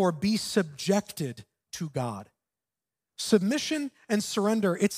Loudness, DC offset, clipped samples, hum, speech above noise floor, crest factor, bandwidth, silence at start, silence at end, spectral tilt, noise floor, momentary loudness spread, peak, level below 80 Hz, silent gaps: -28 LUFS; under 0.1%; under 0.1%; none; over 63 dB; 20 dB; 16 kHz; 0 s; 0 s; -5 dB/octave; under -90 dBFS; 13 LU; -10 dBFS; -68 dBFS; none